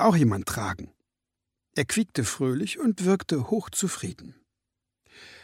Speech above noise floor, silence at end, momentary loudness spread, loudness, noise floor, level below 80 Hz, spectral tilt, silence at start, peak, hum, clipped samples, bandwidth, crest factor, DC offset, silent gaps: 60 dB; 0.05 s; 12 LU; -27 LUFS; -86 dBFS; -56 dBFS; -5 dB/octave; 0 s; -8 dBFS; 50 Hz at -55 dBFS; under 0.1%; 16.5 kHz; 20 dB; under 0.1%; none